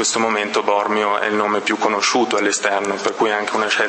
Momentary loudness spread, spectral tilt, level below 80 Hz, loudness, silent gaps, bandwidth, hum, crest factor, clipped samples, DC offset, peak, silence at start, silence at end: 3 LU; -2 dB/octave; -68 dBFS; -18 LUFS; none; 8.8 kHz; none; 16 dB; under 0.1%; under 0.1%; -2 dBFS; 0 s; 0 s